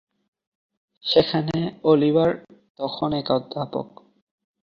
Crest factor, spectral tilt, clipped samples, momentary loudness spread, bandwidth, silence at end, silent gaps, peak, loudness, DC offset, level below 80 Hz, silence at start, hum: 22 dB; -8 dB/octave; under 0.1%; 14 LU; 7 kHz; 0.85 s; 2.70-2.75 s; -2 dBFS; -22 LUFS; under 0.1%; -58 dBFS; 1.05 s; none